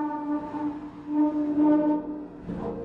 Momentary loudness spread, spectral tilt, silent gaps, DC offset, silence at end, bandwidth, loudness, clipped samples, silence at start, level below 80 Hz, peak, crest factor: 15 LU; -9.5 dB/octave; none; under 0.1%; 0 s; 3.9 kHz; -27 LUFS; under 0.1%; 0 s; -56 dBFS; -14 dBFS; 14 dB